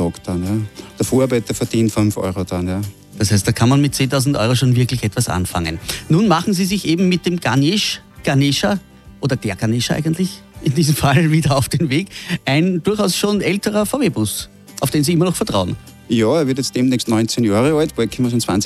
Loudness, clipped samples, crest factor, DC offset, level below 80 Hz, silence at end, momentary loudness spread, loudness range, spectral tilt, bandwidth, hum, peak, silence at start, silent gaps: -17 LUFS; under 0.1%; 16 dB; under 0.1%; -42 dBFS; 0 s; 8 LU; 2 LU; -5.5 dB/octave; 15 kHz; none; 0 dBFS; 0 s; none